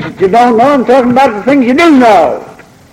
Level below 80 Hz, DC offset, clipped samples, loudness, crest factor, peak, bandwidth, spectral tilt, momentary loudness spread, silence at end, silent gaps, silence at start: -44 dBFS; under 0.1%; 0.2%; -7 LUFS; 8 dB; 0 dBFS; 15 kHz; -5.5 dB/octave; 5 LU; 0.4 s; none; 0 s